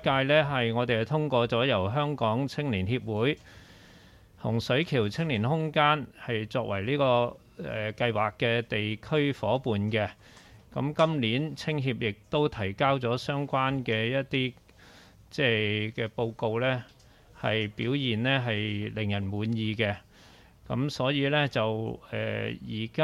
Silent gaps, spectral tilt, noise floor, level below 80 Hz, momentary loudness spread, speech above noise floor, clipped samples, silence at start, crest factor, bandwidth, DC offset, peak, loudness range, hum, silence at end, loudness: none; -6.5 dB/octave; -55 dBFS; -58 dBFS; 9 LU; 27 dB; under 0.1%; 0 s; 20 dB; 12.5 kHz; under 0.1%; -8 dBFS; 3 LU; none; 0 s; -28 LUFS